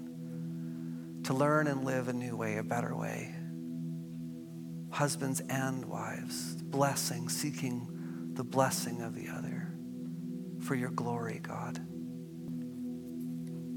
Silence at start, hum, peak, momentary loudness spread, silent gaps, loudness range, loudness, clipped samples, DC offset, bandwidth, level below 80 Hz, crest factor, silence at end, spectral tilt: 0 s; none; -12 dBFS; 11 LU; none; 4 LU; -36 LUFS; under 0.1%; under 0.1%; 17.5 kHz; -78 dBFS; 24 dB; 0 s; -5 dB/octave